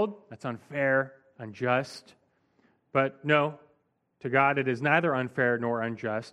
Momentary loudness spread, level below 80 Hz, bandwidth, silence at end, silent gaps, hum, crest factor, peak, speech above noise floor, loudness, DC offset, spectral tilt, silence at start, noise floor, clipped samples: 15 LU; -72 dBFS; 11.5 kHz; 0.05 s; none; none; 22 dB; -6 dBFS; 44 dB; -28 LUFS; under 0.1%; -7 dB/octave; 0 s; -72 dBFS; under 0.1%